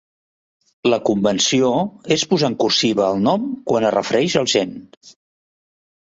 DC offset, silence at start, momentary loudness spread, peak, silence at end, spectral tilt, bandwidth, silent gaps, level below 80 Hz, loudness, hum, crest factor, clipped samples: under 0.1%; 0.85 s; 6 LU; -2 dBFS; 1 s; -4 dB/octave; 8 kHz; 4.97-5.01 s; -58 dBFS; -18 LUFS; none; 18 dB; under 0.1%